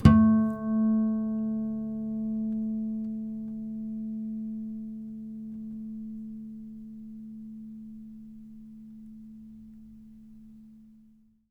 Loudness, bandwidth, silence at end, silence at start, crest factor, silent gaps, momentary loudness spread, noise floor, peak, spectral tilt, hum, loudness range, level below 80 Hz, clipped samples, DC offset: -30 LUFS; 5.2 kHz; 0.6 s; 0 s; 26 dB; none; 23 LU; -59 dBFS; -4 dBFS; -9.5 dB/octave; none; 17 LU; -46 dBFS; under 0.1%; under 0.1%